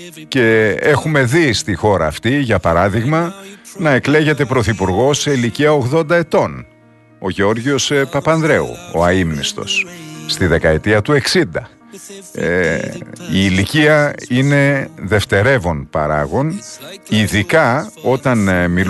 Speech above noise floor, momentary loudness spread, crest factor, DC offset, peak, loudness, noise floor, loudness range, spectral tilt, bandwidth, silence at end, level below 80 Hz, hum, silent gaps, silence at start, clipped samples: 32 dB; 9 LU; 14 dB; under 0.1%; 0 dBFS; -15 LUFS; -46 dBFS; 2 LU; -5 dB/octave; 12.5 kHz; 0 s; -38 dBFS; none; none; 0 s; under 0.1%